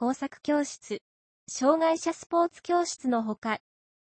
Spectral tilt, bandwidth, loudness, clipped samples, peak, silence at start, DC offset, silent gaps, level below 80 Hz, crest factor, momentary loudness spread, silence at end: -3.5 dB/octave; 8.8 kHz; -28 LUFS; under 0.1%; -10 dBFS; 0 s; under 0.1%; 1.01-1.47 s, 2.26-2.30 s, 3.38-3.42 s; -74 dBFS; 18 dB; 13 LU; 0.5 s